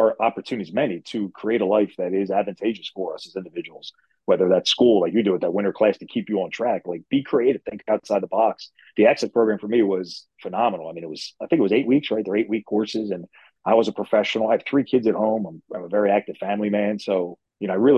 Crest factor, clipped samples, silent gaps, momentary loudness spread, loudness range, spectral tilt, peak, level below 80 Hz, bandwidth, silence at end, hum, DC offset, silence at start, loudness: 18 dB; under 0.1%; none; 14 LU; 3 LU; -6 dB/octave; -4 dBFS; -66 dBFS; 9.6 kHz; 0 s; none; under 0.1%; 0 s; -22 LUFS